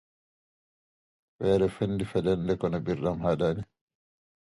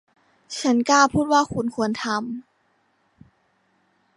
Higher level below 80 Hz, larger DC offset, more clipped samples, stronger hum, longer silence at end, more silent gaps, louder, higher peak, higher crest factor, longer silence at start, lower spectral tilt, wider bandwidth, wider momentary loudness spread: about the same, -52 dBFS vs -54 dBFS; neither; neither; neither; second, 0.9 s vs 1.75 s; neither; second, -28 LUFS vs -21 LUFS; second, -12 dBFS vs -4 dBFS; about the same, 18 dB vs 20 dB; first, 1.4 s vs 0.5 s; first, -8 dB/octave vs -4 dB/octave; about the same, 11.5 kHz vs 11.5 kHz; second, 6 LU vs 16 LU